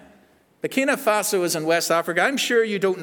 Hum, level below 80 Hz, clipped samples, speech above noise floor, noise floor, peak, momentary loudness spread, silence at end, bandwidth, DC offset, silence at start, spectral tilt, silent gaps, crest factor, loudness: none; -74 dBFS; under 0.1%; 35 dB; -57 dBFS; -6 dBFS; 3 LU; 0 s; over 20 kHz; under 0.1%; 0.65 s; -3 dB/octave; none; 18 dB; -21 LUFS